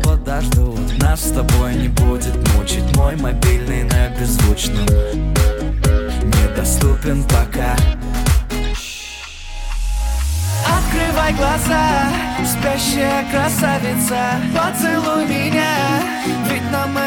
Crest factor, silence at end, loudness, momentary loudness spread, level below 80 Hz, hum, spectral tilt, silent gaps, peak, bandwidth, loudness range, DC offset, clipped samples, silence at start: 14 dB; 0 s; -17 LUFS; 4 LU; -20 dBFS; none; -5 dB/octave; none; -2 dBFS; 17.5 kHz; 3 LU; under 0.1%; under 0.1%; 0 s